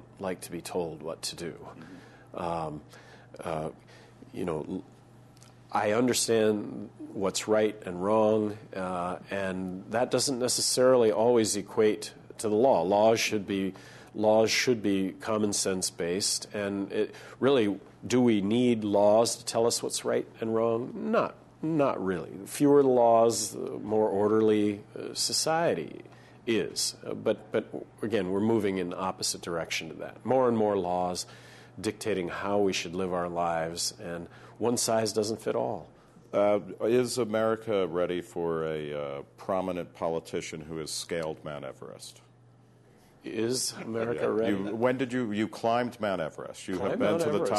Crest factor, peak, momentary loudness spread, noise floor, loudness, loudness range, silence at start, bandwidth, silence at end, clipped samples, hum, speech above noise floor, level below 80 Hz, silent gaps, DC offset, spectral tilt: 18 dB; -10 dBFS; 15 LU; -58 dBFS; -28 LUFS; 10 LU; 0 s; 12.5 kHz; 0 s; under 0.1%; none; 30 dB; -66 dBFS; none; under 0.1%; -4 dB/octave